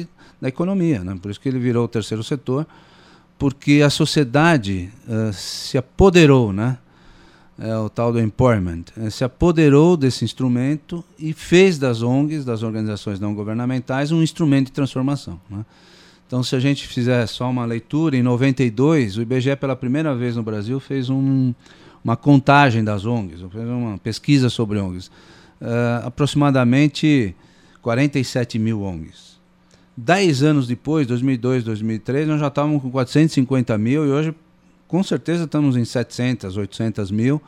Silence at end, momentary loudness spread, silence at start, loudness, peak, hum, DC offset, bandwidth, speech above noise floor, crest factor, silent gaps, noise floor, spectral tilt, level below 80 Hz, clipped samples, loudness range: 0.1 s; 12 LU; 0 s; -19 LUFS; 0 dBFS; none; under 0.1%; 14 kHz; 35 dB; 18 dB; none; -53 dBFS; -6.5 dB/octave; -44 dBFS; under 0.1%; 4 LU